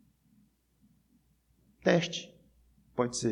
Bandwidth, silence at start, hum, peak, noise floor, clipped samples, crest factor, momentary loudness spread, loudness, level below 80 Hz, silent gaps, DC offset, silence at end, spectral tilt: 11.5 kHz; 1.85 s; none; -12 dBFS; -69 dBFS; under 0.1%; 24 dB; 13 LU; -31 LUFS; -68 dBFS; none; under 0.1%; 0 s; -4.5 dB/octave